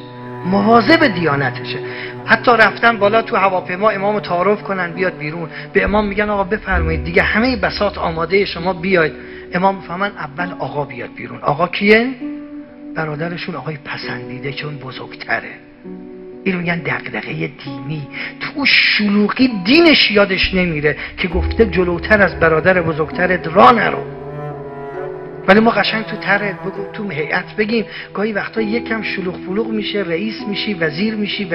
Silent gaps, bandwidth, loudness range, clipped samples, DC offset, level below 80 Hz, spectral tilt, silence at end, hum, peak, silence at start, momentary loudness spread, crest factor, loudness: none; 6.6 kHz; 10 LU; under 0.1%; under 0.1%; -36 dBFS; -7.5 dB/octave; 0 s; none; 0 dBFS; 0 s; 16 LU; 16 dB; -16 LUFS